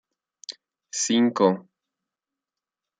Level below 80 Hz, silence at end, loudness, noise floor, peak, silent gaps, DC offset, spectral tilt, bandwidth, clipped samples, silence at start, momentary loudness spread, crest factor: -78 dBFS; 1.4 s; -23 LUFS; -88 dBFS; -6 dBFS; none; under 0.1%; -4 dB/octave; 9.4 kHz; under 0.1%; 0.5 s; 19 LU; 22 dB